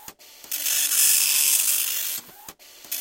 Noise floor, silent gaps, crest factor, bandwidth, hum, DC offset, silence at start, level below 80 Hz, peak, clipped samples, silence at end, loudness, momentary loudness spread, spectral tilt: -45 dBFS; none; 22 dB; 17 kHz; none; under 0.1%; 0 s; -70 dBFS; -2 dBFS; under 0.1%; 0 s; -19 LUFS; 15 LU; 4 dB/octave